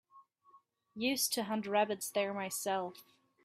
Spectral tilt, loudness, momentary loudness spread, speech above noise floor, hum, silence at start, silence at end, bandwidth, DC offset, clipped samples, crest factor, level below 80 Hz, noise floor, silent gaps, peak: -2.5 dB/octave; -35 LUFS; 6 LU; 31 dB; none; 0.15 s; 0.4 s; 16 kHz; under 0.1%; under 0.1%; 20 dB; -82 dBFS; -67 dBFS; none; -18 dBFS